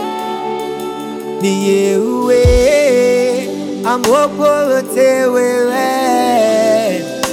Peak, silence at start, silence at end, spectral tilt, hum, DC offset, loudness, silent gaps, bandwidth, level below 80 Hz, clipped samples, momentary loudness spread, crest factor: 0 dBFS; 0 s; 0 s; -5 dB/octave; none; under 0.1%; -13 LUFS; none; 17 kHz; -28 dBFS; under 0.1%; 10 LU; 12 dB